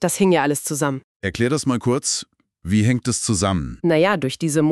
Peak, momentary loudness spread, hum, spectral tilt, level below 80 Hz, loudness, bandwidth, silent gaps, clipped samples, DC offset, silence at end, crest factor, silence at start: -4 dBFS; 7 LU; none; -5 dB/octave; -46 dBFS; -20 LUFS; 13.5 kHz; 1.04-1.20 s; under 0.1%; under 0.1%; 0 s; 16 dB; 0 s